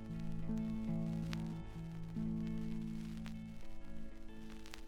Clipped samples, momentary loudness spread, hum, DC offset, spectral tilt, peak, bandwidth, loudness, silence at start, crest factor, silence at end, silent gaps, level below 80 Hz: under 0.1%; 13 LU; none; under 0.1%; -7.5 dB/octave; -20 dBFS; 13 kHz; -44 LUFS; 0 s; 20 dB; 0 s; none; -52 dBFS